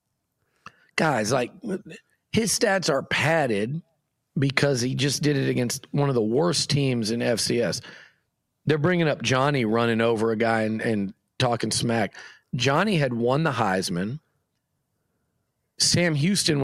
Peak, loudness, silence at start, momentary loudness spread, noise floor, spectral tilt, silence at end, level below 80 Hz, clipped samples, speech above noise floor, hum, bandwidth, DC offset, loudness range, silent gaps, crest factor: -4 dBFS; -23 LUFS; 0.95 s; 10 LU; -76 dBFS; -4.5 dB/octave; 0 s; -60 dBFS; under 0.1%; 53 dB; none; 15 kHz; under 0.1%; 2 LU; none; 20 dB